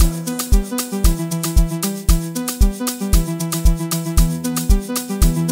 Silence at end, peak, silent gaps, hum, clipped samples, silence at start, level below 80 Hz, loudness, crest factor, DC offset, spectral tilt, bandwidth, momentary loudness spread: 0 s; 0 dBFS; none; none; under 0.1%; 0 s; -18 dBFS; -19 LUFS; 16 dB; 0.3%; -5 dB/octave; 16.5 kHz; 3 LU